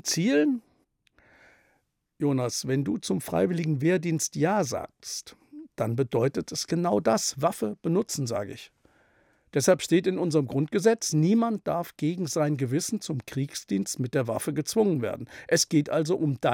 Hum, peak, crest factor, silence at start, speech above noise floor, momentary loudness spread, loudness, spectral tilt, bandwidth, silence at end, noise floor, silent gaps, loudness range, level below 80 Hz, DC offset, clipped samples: none; -8 dBFS; 18 dB; 0.05 s; 46 dB; 9 LU; -27 LUFS; -5 dB/octave; 17.5 kHz; 0 s; -72 dBFS; none; 3 LU; -68 dBFS; under 0.1%; under 0.1%